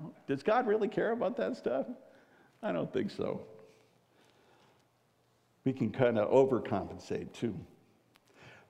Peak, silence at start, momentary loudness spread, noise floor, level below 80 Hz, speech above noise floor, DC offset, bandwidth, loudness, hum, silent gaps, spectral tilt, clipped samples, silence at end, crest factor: -12 dBFS; 0 s; 14 LU; -71 dBFS; -72 dBFS; 39 dB; under 0.1%; 9.8 kHz; -33 LUFS; none; none; -7.5 dB/octave; under 0.1%; 0.15 s; 22 dB